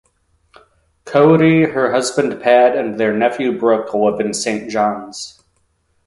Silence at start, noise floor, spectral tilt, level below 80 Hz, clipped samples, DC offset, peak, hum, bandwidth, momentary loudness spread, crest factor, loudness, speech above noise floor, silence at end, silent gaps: 1.05 s; -62 dBFS; -5.5 dB/octave; -56 dBFS; under 0.1%; under 0.1%; 0 dBFS; none; 11.5 kHz; 9 LU; 16 dB; -15 LUFS; 48 dB; 0.75 s; none